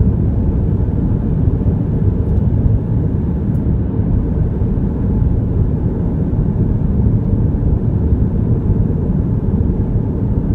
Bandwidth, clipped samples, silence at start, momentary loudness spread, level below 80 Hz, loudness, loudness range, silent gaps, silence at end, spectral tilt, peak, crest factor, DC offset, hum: 2.7 kHz; under 0.1%; 0 s; 2 LU; -20 dBFS; -16 LUFS; 1 LU; none; 0 s; -13 dB/octave; -2 dBFS; 12 dB; under 0.1%; none